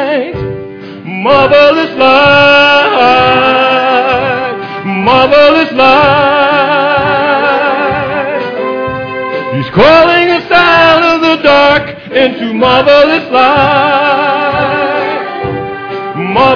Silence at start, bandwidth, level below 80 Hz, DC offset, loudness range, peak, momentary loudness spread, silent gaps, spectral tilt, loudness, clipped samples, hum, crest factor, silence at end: 0 s; 5.4 kHz; -38 dBFS; under 0.1%; 4 LU; 0 dBFS; 12 LU; none; -6 dB/octave; -8 LUFS; 1%; none; 8 dB; 0 s